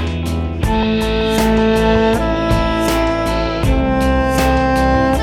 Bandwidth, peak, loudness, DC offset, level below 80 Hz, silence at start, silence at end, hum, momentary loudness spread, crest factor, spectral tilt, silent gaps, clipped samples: 18 kHz; -2 dBFS; -15 LUFS; under 0.1%; -22 dBFS; 0 s; 0 s; none; 4 LU; 14 dB; -6 dB/octave; none; under 0.1%